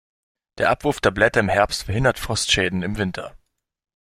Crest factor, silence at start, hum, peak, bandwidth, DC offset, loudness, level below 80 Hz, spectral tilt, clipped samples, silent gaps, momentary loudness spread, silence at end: 20 dB; 0.55 s; none; -2 dBFS; 16 kHz; under 0.1%; -20 LUFS; -40 dBFS; -4 dB/octave; under 0.1%; none; 8 LU; 0.65 s